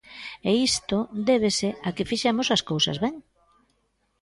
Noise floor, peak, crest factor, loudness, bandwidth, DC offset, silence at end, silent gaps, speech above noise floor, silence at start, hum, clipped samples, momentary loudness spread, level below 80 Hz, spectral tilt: -71 dBFS; -10 dBFS; 16 dB; -24 LUFS; 11.5 kHz; under 0.1%; 1 s; none; 47 dB; 0.1 s; none; under 0.1%; 8 LU; -56 dBFS; -4 dB/octave